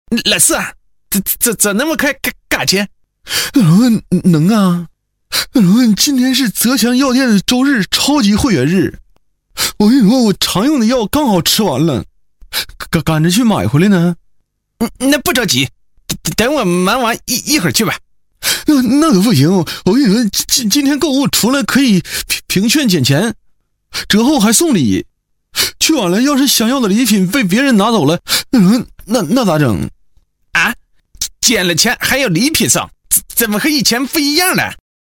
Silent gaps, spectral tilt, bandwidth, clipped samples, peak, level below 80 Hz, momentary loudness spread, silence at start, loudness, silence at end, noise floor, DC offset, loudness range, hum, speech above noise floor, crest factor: none; -4 dB/octave; 17 kHz; under 0.1%; 0 dBFS; -40 dBFS; 8 LU; 0.1 s; -12 LUFS; 0.45 s; -56 dBFS; under 0.1%; 3 LU; none; 44 dB; 12 dB